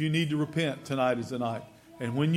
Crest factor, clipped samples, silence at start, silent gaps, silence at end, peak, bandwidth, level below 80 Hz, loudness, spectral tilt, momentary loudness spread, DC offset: 14 dB; under 0.1%; 0 s; none; 0 s; -14 dBFS; 14.5 kHz; -68 dBFS; -30 LUFS; -6.5 dB/octave; 7 LU; under 0.1%